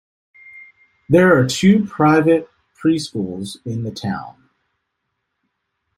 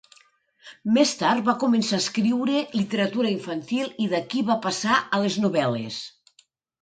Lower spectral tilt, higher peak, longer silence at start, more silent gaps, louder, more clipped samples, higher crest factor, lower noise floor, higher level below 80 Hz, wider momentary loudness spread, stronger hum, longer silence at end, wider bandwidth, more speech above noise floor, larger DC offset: first, -6 dB/octave vs -4.5 dB/octave; first, -2 dBFS vs -6 dBFS; about the same, 0.55 s vs 0.65 s; neither; first, -17 LUFS vs -23 LUFS; neither; about the same, 18 dB vs 18 dB; first, -75 dBFS vs -62 dBFS; first, -54 dBFS vs -68 dBFS; first, 14 LU vs 8 LU; neither; first, 1.7 s vs 0.75 s; first, 15 kHz vs 9.4 kHz; first, 59 dB vs 39 dB; neither